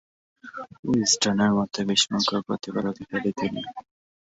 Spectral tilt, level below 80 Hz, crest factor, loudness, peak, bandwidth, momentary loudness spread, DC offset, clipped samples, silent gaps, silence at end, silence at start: -3.5 dB/octave; -60 dBFS; 18 dB; -24 LUFS; -8 dBFS; 8.4 kHz; 18 LU; under 0.1%; under 0.1%; 0.79-0.83 s; 0.55 s; 0.45 s